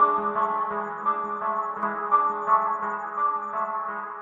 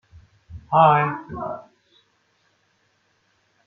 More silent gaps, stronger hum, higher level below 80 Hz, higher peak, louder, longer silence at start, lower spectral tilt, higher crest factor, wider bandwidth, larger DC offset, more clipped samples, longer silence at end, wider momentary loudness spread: neither; neither; second, -70 dBFS vs -56 dBFS; second, -8 dBFS vs -2 dBFS; second, -26 LUFS vs -20 LUFS; second, 0 s vs 0.5 s; second, -7 dB/octave vs -8.5 dB/octave; second, 16 dB vs 22 dB; first, 7.2 kHz vs 6 kHz; neither; neither; second, 0 s vs 2.05 s; second, 7 LU vs 17 LU